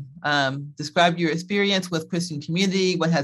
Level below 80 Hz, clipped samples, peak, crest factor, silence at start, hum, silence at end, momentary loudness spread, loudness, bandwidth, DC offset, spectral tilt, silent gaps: -68 dBFS; under 0.1%; -4 dBFS; 20 dB; 0 s; none; 0 s; 7 LU; -23 LUFS; 12.5 kHz; under 0.1%; -4.5 dB/octave; none